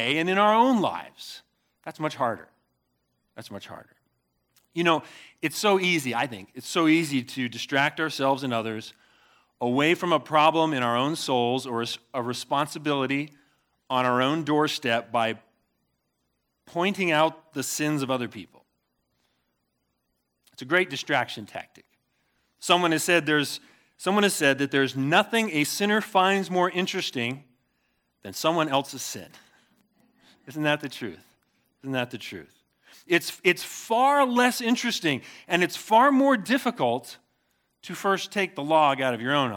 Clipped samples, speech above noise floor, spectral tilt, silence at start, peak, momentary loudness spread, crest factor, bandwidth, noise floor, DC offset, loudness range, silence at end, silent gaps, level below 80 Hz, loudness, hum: under 0.1%; 51 dB; -4 dB/octave; 0 s; -4 dBFS; 17 LU; 22 dB; 19 kHz; -76 dBFS; under 0.1%; 9 LU; 0 s; none; -78 dBFS; -24 LUFS; none